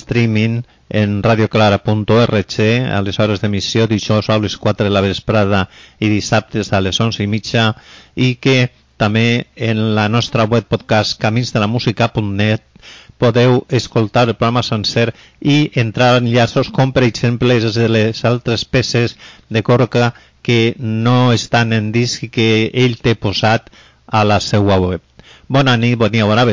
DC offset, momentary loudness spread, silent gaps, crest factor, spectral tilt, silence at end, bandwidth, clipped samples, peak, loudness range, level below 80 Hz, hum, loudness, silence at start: under 0.1%; 5 LU; none; 10 dB; -6 dB/octave; 0 s; 7.6 kHz; under 0.1%; -4 dBFS; 2 LU; -40 dBFS; none; -15 LUFS; 0 s